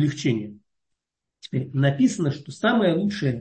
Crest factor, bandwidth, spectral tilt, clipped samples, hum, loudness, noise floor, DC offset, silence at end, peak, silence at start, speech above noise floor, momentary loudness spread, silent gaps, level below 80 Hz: 16 dB; 8.8 kHz; -6.5 dB/octave; under 0.1%; none; -23 LUFS; -82 dBFS; under 0.1%; 0 s; -8 dBFS; 0 s; 59 dB; 10 LU; none; -64 dBFS